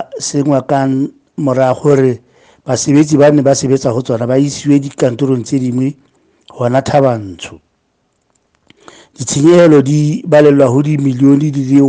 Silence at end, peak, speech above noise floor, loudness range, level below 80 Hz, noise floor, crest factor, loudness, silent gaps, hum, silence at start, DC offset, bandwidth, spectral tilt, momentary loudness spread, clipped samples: 0 s; 0 dBFS; 51 dB; 7 LU; -52 dBFS; -62 dBFS; 12 dB; -11 LUFS; none; none; 0 s; under 0.1%; 9.8 kHz; -6.5 dB/octave; 11 LU; 0.2%